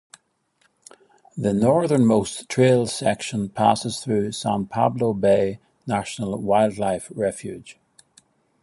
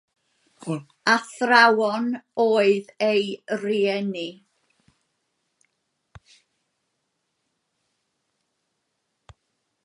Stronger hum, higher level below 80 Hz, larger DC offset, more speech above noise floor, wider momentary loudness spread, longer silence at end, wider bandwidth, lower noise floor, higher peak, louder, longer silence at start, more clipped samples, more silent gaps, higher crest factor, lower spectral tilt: neither; first, -56 dBFS vs -70 dBFS; neither; second, 45 dB vs 55 dB; second, 9 LU vs 16 LU; second, 0.9 s vs 5.5 s; about the same, 11.5 kHz vs 11.5 kHz; second, -66 dBFS vs -76 dBFS; about the same, -2 dBFS vs -2 dBFS; about the same, -22 LUFS vs -22 LUFS; first, 1.35 s vs 0.65 s; neither; neither; about the same, 20 dB vs 24 dB; first, -6 dB/octave vs -4.5 dB/octave